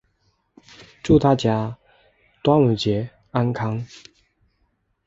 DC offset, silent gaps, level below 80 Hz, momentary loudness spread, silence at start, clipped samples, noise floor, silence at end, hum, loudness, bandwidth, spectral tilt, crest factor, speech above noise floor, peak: under 0.1%; none; -46 dBFS; 15 LU; 0.8 s; under 0.1%; -68 dBFS; 1.2 s; none; -21 LUFS; 7.8 kHz; -7.5 dB/octave; 20 dB; 49 dB; -4 dBFS